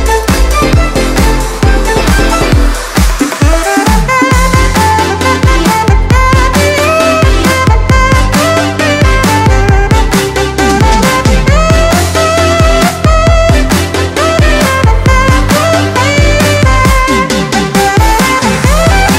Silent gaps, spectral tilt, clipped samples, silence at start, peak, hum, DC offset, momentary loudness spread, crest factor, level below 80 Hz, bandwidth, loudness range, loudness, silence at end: none; -5 dB/octave; 0.2%; 0 s; 0 dBFS; none; under 0.1%; 3 LU; 8 dB; -12 dBFS; 16.5 kHz; 1 LU; -8 LUFS; 0 s